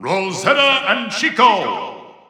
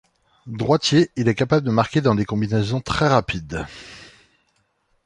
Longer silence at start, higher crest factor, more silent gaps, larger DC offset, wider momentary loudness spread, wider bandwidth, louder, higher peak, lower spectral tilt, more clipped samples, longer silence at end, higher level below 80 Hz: second, 0 s vs 0.45 s; about the same, 16 dB vs 20 dB; neither; neither; second, 11 LU vs 15 LU; first, 14 kHz vs 11 kHz; first, -15 LUFS vs -20 LUFS; about the same, 0 dBFS vs -2 dBFS; second, -3 dB/octave vs -6 dB/octave; neither; second, 0.2 s vs 1 s; second, -78 dBFS vs -44 dBFS